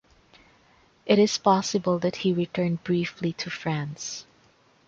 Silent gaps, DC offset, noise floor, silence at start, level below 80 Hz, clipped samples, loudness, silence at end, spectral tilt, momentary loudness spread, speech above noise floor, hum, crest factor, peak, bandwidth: none; under 0.1%; -60 dBFS; 1.05 s; -64 dBFS; under 0.1%; -25 LUFS; 0.65 s; -5 dB/octave; 13 LU; 36 dB; none; 20 dB; -6 dBFS; 7.8 kHz